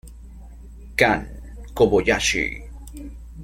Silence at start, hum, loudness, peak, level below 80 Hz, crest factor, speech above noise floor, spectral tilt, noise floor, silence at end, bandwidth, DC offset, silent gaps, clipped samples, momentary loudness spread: 0.05 s; none; -20 LUFS; 0 dBFS; -38 dBFS; 24 dB; 21 dB; -3.5 dB/octave; -40 dBFS; 0 s; 16.5 kHz; under 0.1%; none; under 0.1%; 21 LU